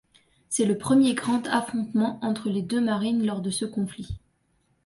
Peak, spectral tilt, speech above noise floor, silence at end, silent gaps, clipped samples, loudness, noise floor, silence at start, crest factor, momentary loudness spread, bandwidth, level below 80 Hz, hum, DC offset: -10 dBFS; -5 dB/octave; 44 dB; 0.65 s; none; under 0.1%; -25 LUFS; -69 dBFS; 0.5 s; 16 dB; 11 LU; 11.5 kHz; -54 dBFS; none; under 0.1%